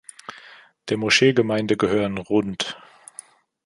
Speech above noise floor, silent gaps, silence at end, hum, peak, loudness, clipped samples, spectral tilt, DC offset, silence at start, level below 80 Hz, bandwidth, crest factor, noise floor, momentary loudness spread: 27 dB; none; 0.9 s; none; -2 dBFS; -21 LUFS; under 0.1%; -4.5 dB/octave; under 0.1%; 0.3 s; -56 dBFS; 11.5 kHz; 20 dB; -48 dBFS; 24 LU